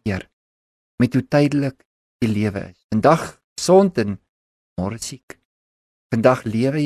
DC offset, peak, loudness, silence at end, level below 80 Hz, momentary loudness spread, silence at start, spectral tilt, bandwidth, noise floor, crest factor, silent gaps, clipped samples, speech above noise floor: under 0.1%; -2 dBFS; -20 LUFS; 0 s; -48 dBFS; 16 LU; 0.05 s; -6.5 dB/octave; 13.5 kHz; under -90 dBFS; 20 dB; 0.33-0.98 s, 1.85-2.19 s, 2.84-2.89 s, 3.44-3.56 s, 4.29-4.76 s, 5.23-5.28 s, 5.45-6.10 s; under 0.1%; over 72 dB